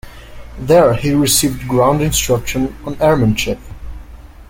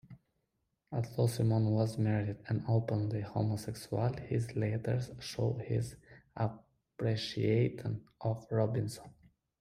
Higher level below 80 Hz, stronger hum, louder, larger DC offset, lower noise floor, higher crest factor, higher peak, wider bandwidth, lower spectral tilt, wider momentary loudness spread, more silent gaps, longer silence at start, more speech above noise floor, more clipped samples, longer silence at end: first, -32 dBFS vs -62 dBFS; neither; first, -14 LUFS vs -35 LUFS; neither; second, -35 dBFS vs -82 dBFS; about the same, 14 dB vs 18 dB; first, 0 dBFS vs -18 dBFS; first, 17 kHz vs 14.5 kHz; second, -4.5 dB/octave vs -7 dB/octave; first, 16 LU vs 9 LU; neither; about the same, 0.05 s vs 0.1 s; second, 21 dB vs 49 dB; neither; second, 0.05 s vs 0.5 s